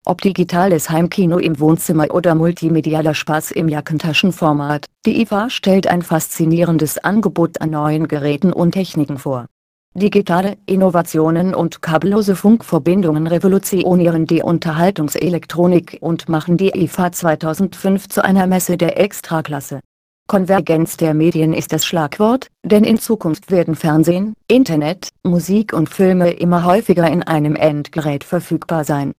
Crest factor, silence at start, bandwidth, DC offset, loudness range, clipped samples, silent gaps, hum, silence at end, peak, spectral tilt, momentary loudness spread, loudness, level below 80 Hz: 14 dB; 0.05 s; 15.5 kHz; under 0.1%; 2 LU; under 0.1%; 9.51-9.92 s, 19.85-20.26 s; none; 0.05 s; 0 dBFS; -6 dB/octave; 6 LU; -15 LUFS; -50 dBFS